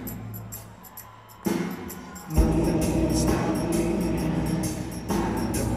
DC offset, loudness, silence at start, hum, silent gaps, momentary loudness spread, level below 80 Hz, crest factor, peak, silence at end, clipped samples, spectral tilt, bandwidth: under 0.1%; -26 LUFS; 0 s; none; none; 16 LU; -34 dBFS; 18 dB; -8 dBFS; 0 s; under 0.1%; -6 dB/octave; 15.5 kHz